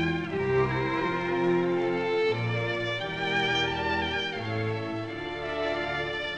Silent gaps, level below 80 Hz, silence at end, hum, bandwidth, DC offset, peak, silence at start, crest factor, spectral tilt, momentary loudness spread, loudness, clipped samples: none; -52 dBFS; 0 s; none; 9 kHz; 0.2%; -14 dBFS; 0 s; 14 dB; -6 dB/octave; 6 LU; -28 LUFS; under 0.1%